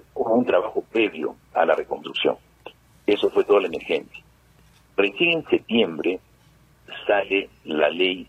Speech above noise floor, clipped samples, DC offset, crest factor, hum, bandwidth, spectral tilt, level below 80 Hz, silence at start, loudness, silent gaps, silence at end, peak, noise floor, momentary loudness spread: 33 dB; under 0.1%; under 0.1%; 20 dB; none; 8.6 kHz; -5.5 dB/octave; -60 dBFS; 0.15 s; -22 LUFS; none; 0.05 s; -4 dBFS; -56 dBFS; 10 LU